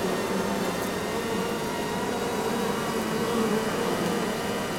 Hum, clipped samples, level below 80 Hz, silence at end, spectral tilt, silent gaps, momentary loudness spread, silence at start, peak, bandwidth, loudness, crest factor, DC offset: none; under 0.1%; -52 dBFS; 0 s; -4.5 dB/octave; none; 3 LU; 0 s; -14 dBFS; 16.5 kHz; -28 LUFS; 14 dB; under 0.1%